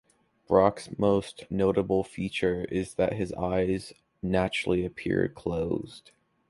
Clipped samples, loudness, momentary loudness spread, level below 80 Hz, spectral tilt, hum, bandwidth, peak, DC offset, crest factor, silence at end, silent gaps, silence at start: under 0.1%; -28 LUFS; 8 LU; -50 dBFS; -6.5 dB/octave; none; 11.5 kHz; -6 dBFS; under 0.1%; 22 dB; 0.5 s; none; 0.5 s